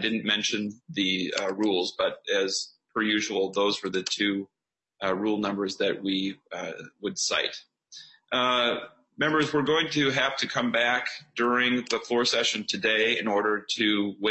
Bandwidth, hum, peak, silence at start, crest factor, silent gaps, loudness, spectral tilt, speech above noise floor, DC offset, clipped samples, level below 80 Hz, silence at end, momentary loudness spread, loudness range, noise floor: 8.4 kHz; none; -8 dBFS; 0 s; 18 dB; none; -26 LUFS; -3 dB/octave; 23 dB; under 0.1%; under 0.1%; -70 dBFS; 0 s; 10 LU; 4 LU; -50 dBFS